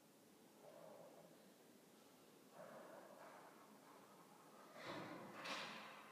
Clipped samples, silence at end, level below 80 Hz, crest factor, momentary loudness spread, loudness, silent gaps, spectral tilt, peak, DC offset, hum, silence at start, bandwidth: under 0.1%; 0 s; under -90 dBFS; 22 dB; 17 LU; -58 LUFS; none; -3.5 dB/octave; -36 dBFS; under 0.1%; none; 0 s; 15.5 kHz